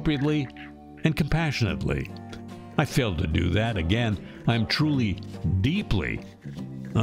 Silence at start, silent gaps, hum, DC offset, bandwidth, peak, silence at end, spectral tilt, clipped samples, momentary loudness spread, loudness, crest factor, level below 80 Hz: 0 s; none; none; under 0.1%; 16 kHz; -8 dBFS; 0 s; -6.5 dB/octave; under 0.1%; 14 LU; -26 LUFS; 18 dB; -40 dBFS